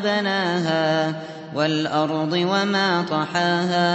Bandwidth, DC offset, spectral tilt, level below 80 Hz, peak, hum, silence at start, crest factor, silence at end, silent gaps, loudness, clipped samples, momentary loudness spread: 8.4 kHz; under 0.1%; -5.5 dB/octave; -68 dBFS; -8 dBFS; none; 0 s; 14 dB; 0 s; none; -21 LUFS; under 0.1%; 4 LU